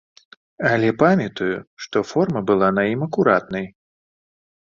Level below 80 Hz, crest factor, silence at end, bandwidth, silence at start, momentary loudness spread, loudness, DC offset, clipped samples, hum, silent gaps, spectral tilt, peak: -56 dBFS; 18 dB; 1.1 s; 7.4 kHz; 0.6 s; 11 LU; -20 LUFS; under 0.1%; under 0.1%; none; 1.67-1.77 s; -7 dB/octave; -2 dBFS